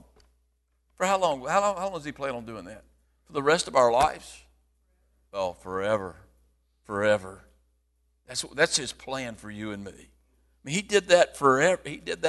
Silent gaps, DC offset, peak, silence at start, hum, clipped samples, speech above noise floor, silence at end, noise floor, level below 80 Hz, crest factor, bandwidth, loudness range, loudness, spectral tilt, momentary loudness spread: none; under 0.1%; -6 dBFS; 1 s; none; under 0.1%; 45 dB; 0 s; -71 dBFS; -58 dBFS; 22 dB; 12.5 kHz; 6 LU; -26 LUFS; -3 dB/octave; 19 LU